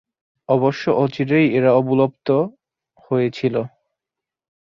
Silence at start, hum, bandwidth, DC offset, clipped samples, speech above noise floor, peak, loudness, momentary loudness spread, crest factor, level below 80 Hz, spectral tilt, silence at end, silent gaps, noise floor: 0.5 s; none; 7.2 kHz; under 0.1%; under 0.1%; 69 dB; -2 dBFS; -19 LUFS; 8 LU; 18 dB; -62 dBFS; -8.5 dB/octave; 1 s; none; -86 dBFS